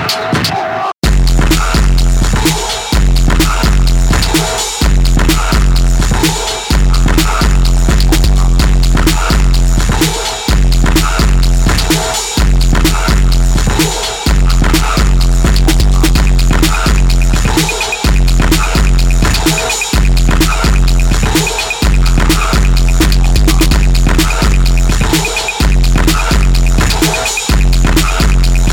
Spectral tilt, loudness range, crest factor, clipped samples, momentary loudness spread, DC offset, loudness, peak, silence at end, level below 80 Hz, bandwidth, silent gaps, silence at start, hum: -4 dB/octave; 1 LU; 8 dB; under 0.1%; 2 LU; under 0.1%; -11 LUFS; 0 dBFS; 0 s; -10 dBFS; 17.5 kHz; none; 0 s; none